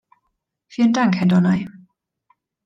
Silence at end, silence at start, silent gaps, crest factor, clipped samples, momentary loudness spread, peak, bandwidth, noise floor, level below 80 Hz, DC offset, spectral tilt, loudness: 0.95 s; 0.75 s; none; 16 dB; under 0.1%; 16 LU; -6 dBFS; 7.4 kHz; -75 dBFS; -62 dBFS; under 0.1%; -7 dB/octave; -18 LUFS